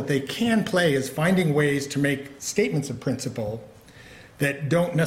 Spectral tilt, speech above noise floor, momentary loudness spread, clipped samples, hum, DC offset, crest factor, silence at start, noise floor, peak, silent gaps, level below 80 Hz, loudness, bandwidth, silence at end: -5.5 dB/octave; 23 dB; 8 LU; under 0.1%; none; under 0.1%; 16 dB; 0 s; -47 dBFS; -8 dBFS; none; -58 dBFS; -24 LUFS; 16.5 kHz; 0 s